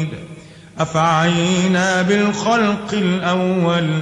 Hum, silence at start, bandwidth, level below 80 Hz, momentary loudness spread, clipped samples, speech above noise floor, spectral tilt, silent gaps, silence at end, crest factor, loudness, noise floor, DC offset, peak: none; 0 s; 10.5 kHz; -52 dBFS; 8 LU; under 0.1%; 21 dB; -5.5 dB/octave; none; 0 s; 14 dB; -17 LUFS; -38 dBFS; under 0.1%; -4 dBFS